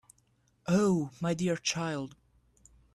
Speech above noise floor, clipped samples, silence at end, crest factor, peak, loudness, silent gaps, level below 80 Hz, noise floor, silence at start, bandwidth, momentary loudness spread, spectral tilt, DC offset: 40 dB; under 0.1%; 0.85 s; 18 dB; -14 dBFS; -30 LUFS; none; -66 dBFS; -70 dBFS; 0.65 s; 12.5 kHz; 14 LU; -5 dB/octave; under 0.1%